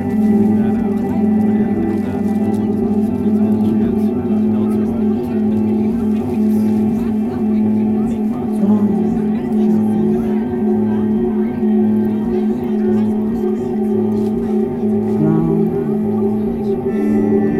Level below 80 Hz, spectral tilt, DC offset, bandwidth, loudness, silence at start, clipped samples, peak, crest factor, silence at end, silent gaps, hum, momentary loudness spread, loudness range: -42 dBFS; -10 dB/octave; under 0.1%; 4.1 kHz; -16 LUFS; 0 s; under 0.1%; -2 dBFS; 12 dB; 0 s; none; none; 3 LU; 1 LU